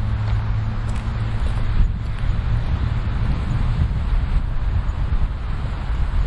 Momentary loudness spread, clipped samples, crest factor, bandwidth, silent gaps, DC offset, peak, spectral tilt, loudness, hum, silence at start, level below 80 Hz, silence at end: 3 LU; under 0.1%; 14 dB; 8.4 kHz; none; under 0.1%; -6 dBFS; -7.5 dB/octave; -24 LUFS; none; 0 s; -22 dBFS; 0 s